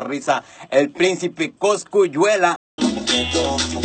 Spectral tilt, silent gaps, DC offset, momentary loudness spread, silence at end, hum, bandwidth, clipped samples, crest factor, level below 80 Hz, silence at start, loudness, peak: -3.5 dB/octave; 2.56-2.78 s; under 0.1%; 6 LU; 0 s; none; 9 kHz; under 0.1%; 18 dB; -44 dBFS; 0 s; -19 LUFS; -2 dBFS